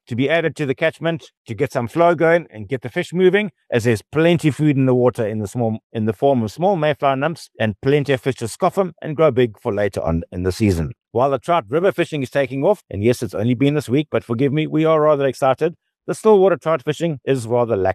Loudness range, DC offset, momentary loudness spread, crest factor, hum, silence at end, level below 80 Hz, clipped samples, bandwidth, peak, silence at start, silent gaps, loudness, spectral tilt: 2 LU; under 0.1%; 8 LU; 16 dB; none; 0 s; -46 dBFS; under 0.1%; 13 kHz; -2 dBFS; 0.1 s; 1.37-1.45 s, 5.84-5.90 s; -19 LUFS; -7 dB/octave